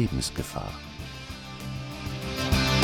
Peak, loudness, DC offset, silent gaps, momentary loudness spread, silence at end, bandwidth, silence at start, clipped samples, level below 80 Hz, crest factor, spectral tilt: -8 dBFS; -31 LUFS; under 0.1%; none; 14 LU; 0 s; 18 kHz; 0 s; under 0.1%; -40 dBFS; 22 dB; -4.5 dB/octave